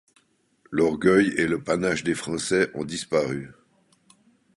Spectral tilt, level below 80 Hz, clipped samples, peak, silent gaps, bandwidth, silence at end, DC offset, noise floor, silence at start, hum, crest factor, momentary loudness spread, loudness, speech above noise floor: -5 dB/octave; -56 dBFS; under 0.1%; -6 dBFS; none; 11.5 kHz; 1.05 s; under 0.1%; -63 dBFS; 0.7 s; none; 20 dB; 11 LU; -24 LUFS; 40 dB